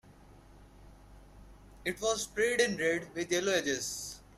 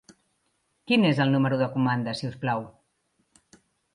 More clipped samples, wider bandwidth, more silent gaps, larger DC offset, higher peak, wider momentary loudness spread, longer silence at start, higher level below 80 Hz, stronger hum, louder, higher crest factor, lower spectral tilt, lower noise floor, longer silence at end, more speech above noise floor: neither; first, 15.5 kHz vs 11 kHz; neither; neither; second, -14 dBFS vs -10 dBFS; about the same, 10 LU vs 10 LU; second, 0.05 s vs 0.9 s; first, -58 dBFS vs -66 dBFS; neither; second, -32 LUFS vs -25 LUFS; about the same, 20 dB vs 18 dB; second, -2.5 dB/octave vs -7 dB/octave; second, -56 dBFS vs -73 dBFS; second, 0.15 s vs 1.25 s; second, 24 dB vs 49 dB